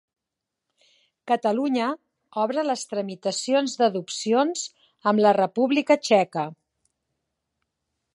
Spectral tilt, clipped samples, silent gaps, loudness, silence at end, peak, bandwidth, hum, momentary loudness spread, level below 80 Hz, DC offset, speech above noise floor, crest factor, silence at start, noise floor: -4 dB/octave; under 0.1%; none; -23 LUFS; 1.6 s; -6 dBFS; 11.5 kHz; none; 11 LU; -80 dBFS; under 0.1%; 63 dB; 20 dB; 1.25 s; -85 dBFS